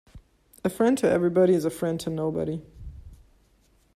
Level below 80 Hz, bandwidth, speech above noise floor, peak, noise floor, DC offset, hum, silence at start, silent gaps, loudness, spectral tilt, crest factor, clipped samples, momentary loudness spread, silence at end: -52 dBFS; 15 kHz; 39 dB; -10 dBFS; -63 dBFS; under 0.1%; none; 0.15 s; none; -25 LUFS; -6.5 dB/octave; 18 dB; under 0.1%; 20 LU; 0.8 s